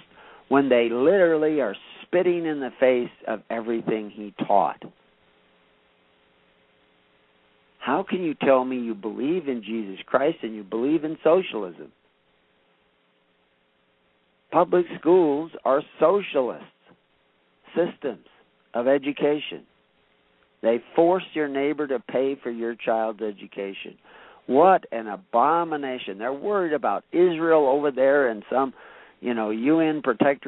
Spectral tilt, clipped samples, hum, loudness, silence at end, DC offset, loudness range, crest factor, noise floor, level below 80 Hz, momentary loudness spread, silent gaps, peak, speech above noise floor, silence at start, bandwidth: -10.5 dB/octave; under 0.1%; none; -23 LUFS; 0 s; under 0.1%; 7 LU; 20 dB; -66 dBFS; -70 dBFS; 13 LU; none; -4 dBFS; 43 dB; 0.5 s; 4.1 kHz